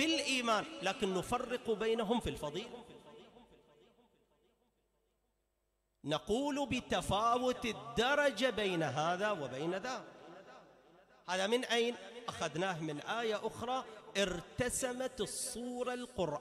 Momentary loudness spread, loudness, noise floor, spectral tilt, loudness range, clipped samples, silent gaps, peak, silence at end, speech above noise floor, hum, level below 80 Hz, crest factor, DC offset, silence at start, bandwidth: 13 LU; -36 LUFS; -82 dBFS; -3.5 dB/octave; 8 LU; under 0.1%; none; -22 dBFS; 0 s; 46 dB; none; -62 dBFS; 16 dB; under 0.1%; 0 s; 15 kHz